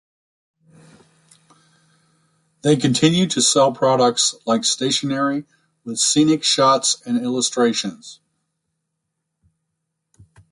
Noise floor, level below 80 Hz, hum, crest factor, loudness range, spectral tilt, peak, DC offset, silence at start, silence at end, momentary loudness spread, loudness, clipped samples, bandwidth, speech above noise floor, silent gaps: -77 dBFS; -62 dBFS; none; 18 dB; 7 LU; -3.5 dB/octave; -2 dBFS; under 0.1%; 2.65 s; 2.35 s; 10 LU; -17 LUFS; under 0.1%; 11.5 kHz; 59 dB; none